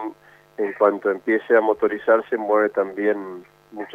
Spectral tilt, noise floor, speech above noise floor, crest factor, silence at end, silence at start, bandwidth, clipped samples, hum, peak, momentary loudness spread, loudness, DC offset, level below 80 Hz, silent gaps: -7 dB/octave; -40 dBFS; 20 dB; 18 dB; 0 s; 0 s; 4.8 kHz; under 0.1%; none; -4 dBFS; 18 LU; -21 LUFS; under 0.1%; -70 dBFS; none